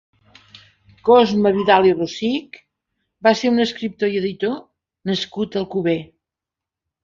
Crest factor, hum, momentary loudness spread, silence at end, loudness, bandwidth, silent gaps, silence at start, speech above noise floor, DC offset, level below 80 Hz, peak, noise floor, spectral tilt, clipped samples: 18 dB; none; 11 LU; 1 s; -19 LUFS; 7.6 kHz; none; 1.05 s; 69 dB; under 0.1%; -58 dBFS; -2 dBFS; -87 dBFS; -5.5 dB/octave; under 0.1%